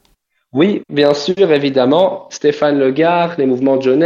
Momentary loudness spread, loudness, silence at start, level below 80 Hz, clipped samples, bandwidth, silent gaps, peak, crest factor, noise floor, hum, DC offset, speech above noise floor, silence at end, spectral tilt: 4 LU; -14 LUFS; 0.55 s; -60 dBFS; under 0.1%; 7.6 kHz; none; 0 dBFS; 12 dB; -60 dBFS; none; under 0.1%; 47 dB; 0 s; -6 dB/octave